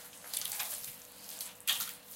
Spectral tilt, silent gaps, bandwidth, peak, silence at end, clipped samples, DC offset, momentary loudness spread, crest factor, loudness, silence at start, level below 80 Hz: 1.5 dB/octave; none; 17 kHz; -14 dBFS; 0 s; under 0.1%; under 0.1%; 12 LU; 26 dB; -37 LUFS; 0 s; -80 dBFS